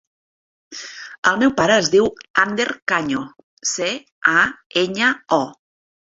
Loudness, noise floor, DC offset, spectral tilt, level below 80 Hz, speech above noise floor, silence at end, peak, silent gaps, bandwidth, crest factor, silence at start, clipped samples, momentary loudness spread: -18 LUFS; under -90 dBFS; under 0.1%; -3 dB/octave; -58 dBFS; over 71 dB; 0.5 s; -2 dBFS; 1.18-1.23 s, 2.30-2.34 s, 2.82-2.87 s, 3.43-3.57 s, 4.12-4.21 s, 4.66-4.70 s; 8 kHz; 20 dB; 0.7 s; under 0.1%; 17 LU